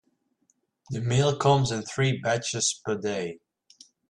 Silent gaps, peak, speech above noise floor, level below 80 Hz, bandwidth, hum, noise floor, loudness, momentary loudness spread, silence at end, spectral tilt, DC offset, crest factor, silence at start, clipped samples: none; -8 dBFS; 46 dB; -60 dBFS; 11 kHz; none; -72 dBFS; -26 LUFS; 10 LU; 0.75 s; -4.5 dB/octave; under 0.1%; 18 dB; 0.9 s; under 0.1%